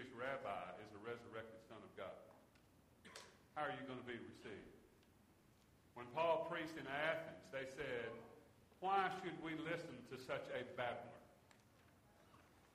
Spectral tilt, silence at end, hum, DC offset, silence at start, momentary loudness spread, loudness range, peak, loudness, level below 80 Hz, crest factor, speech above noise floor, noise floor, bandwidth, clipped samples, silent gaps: -5 dB/octave; 0.05 s; none; under 0.1%; 0 s; 19 LU; 8 LU; -26 dBFS; -47 LUFS; -80 dBFS; 24 dB; 25 dB; -71 dBFS; 15 kHz; under 0.1%; none